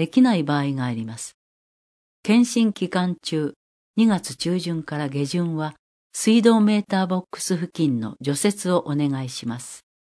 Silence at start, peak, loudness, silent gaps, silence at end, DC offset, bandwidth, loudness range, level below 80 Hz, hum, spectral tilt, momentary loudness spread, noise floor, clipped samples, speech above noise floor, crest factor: 0 s; -4 dBFS; -22 LUFS; 1.34-2.23 s, 3.56-3.94 s, 5.79-6.10 s; 0.3 s; under 0.1%; 11 kHz; 3 LU; -66 dBFS; none; -5.5 dB/octave; 13 LU; under -90 dBFS; under 0.1%; over 69 dB; 20 dB